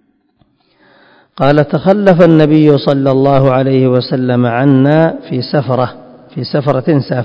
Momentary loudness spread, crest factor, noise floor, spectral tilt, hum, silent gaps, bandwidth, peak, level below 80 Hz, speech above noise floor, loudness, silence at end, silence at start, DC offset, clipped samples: 8 LU; 10 dB; -55 dBFS; -9.5 dB/octave; none; none; 6.4 kHz; 0 dBFS; -48 dBFS; 46 dB; -11 LUFS; 0 s; 1.4 s; under 0.1%; 1%